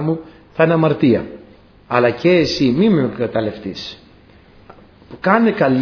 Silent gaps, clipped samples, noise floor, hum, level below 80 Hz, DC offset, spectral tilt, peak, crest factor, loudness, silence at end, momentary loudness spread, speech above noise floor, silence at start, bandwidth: none; under 0.1%; -46 dBFS; none; -48 dBFS; under 0.1%; -7 dB/octave; 0 dBFS; 18 dB; -16 LUFS; 0 s; 14 LU; 31 dB; 0 s; 5.4 kHz